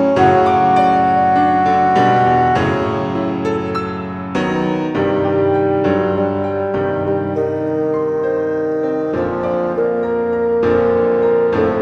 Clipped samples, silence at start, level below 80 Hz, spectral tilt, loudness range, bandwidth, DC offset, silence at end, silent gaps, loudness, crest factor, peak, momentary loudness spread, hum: under 0.1%; 0 s; -46 dBFS; -7.5 dB/octave; 4 LU; 8.4 kHz; under 0.1%; 0 s; none; -16 LUFS; 14 dB; -2 dBFS; 7 LU; none